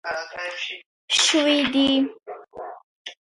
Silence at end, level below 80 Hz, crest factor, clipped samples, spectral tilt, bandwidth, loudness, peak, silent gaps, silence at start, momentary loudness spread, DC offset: 0.1 s; -62 dBFS; 18 dB; under 0.1%; -1 dB/octave; 11.5 kHz; -21 LUFS; -6 dBFS; 0.86-1.08 s, 2.84-3.05 s; 0.05 s; 22 LU; under 0.1%